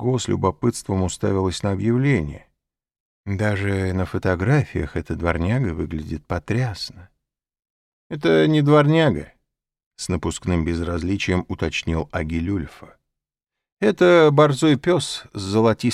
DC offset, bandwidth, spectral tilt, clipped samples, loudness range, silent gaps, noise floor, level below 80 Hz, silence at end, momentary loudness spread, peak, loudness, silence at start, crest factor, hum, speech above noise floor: under 0.1%; 13 kHz; -6.5 dB/octave; under 0.1%; 6 LU; 3.00-3.24 s, 7.70-8.10 s, 9.86-9.91 s, 13.72-13.77 s; -86 dBFS; -40 dBFS; 0 s; 13 LU; -2 dBFS; -21 LUFS; 0 s; 18 dB; none; 66 dB